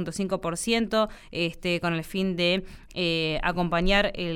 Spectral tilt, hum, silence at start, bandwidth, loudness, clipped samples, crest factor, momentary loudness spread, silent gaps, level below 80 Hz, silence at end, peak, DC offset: -4.5 dB/octave; none; 0 s; 17.5 kHz; -26 LUFS; under 0.1%; 18 dB; 6 LU; none; -40 dBFS; 0 s; -8 dBFS; under 0.1%